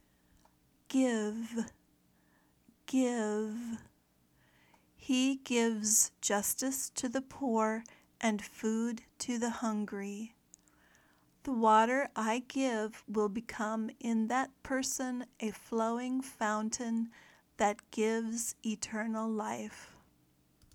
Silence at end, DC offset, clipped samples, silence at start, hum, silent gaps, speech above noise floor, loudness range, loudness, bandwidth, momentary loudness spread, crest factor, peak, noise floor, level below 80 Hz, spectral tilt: 0.85 s; under 0.1%; under 0.1%; 0.9 s; none; none; 37 dB; 6 LU; -34 LUFS; 18.5 kHz; 11 LU; 20 dB; -14 dBFS; -70 dBFS; -72 dBFS; -3 dB/octave